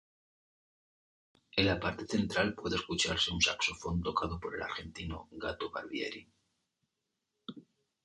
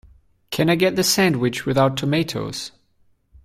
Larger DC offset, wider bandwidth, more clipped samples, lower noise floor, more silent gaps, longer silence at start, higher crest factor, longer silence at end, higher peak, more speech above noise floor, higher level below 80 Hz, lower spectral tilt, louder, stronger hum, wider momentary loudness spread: neither; second, 11 kHz vs 16 kHz; neither; first, -86 dBFS vs -61 dBFS; neither; first, 1.55 s vs 0.5 s; first, 24 dB vs 16 dB; second, 0.45 s vs 0.75 s; second, -12 dBFS vs -4 dBFS; first, 51 dB vs 41 dB; about the same, -54 dBFS vs -52 dBFS; about the same, -3.5 dB/octave vs -4.5 dB/octave; second, -34 LUFS vs -20 LUFS; neither; about the same, 14 LU vs 13 LU